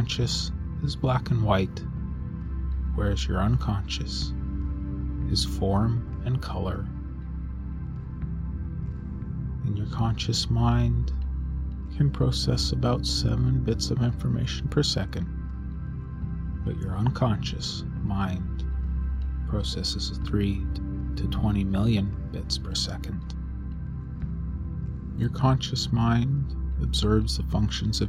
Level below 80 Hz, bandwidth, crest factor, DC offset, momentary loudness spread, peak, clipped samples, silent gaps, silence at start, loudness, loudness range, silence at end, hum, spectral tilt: -32 dBFS; 12.5 kHz; 18 dB; under 0.1%; 10 LU; -8 dBFS; under 0.1%; none; 0 s; -28 LUFS; 4 LU; 0 s; none; -6 dB/octave